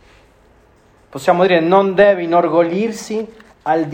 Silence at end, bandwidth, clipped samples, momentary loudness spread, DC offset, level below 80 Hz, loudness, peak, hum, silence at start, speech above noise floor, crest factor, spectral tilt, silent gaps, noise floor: 0 s; 16 kHz; under 0.1%; 14 LU; under 0.1%; -54 dBFS; -15 LUFS; 0 dBFS; none; 1.15 s; 36 dB; 16 dB; -6 dB/octave; none; -50 dBFS